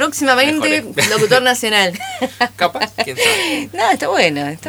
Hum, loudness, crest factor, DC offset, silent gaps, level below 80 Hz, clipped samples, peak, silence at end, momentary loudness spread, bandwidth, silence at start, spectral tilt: none; -15 LUFS; 16 dB; under 0.1%; none; -56 dBFS; under 0.1%; 0 dBFS; 0 s; 7 LU; over 20 kHz; 0 s; -2.5 dB/octave